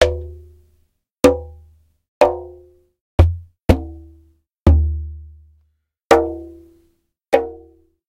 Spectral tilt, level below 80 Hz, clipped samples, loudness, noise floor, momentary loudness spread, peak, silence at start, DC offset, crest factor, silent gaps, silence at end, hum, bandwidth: -6.5 dB/octave; -26 dBFS; under 0.1%; -18 LUFS; -65 dBFS; 21 LU; 0 dBFS; 0 s; under 0.1%; 20 dB; 2.08-2.21 s, 3.01-3.18 s, 4.58-4.66 s; 0.55 s; none; 15 kHz